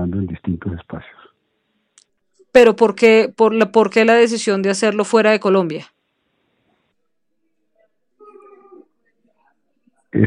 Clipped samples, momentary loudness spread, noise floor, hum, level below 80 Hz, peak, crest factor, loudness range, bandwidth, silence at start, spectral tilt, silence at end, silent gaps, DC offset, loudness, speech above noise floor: under 0.1%; 15 LU; -75 dBFS; none; -52 dBFS; 0 dBFS; 18 dB; 8 LU; 11 kHz; 0 s; -5.5 dB/octave; 0 s; none; under 0.1%; -15 LUFS; 61 dB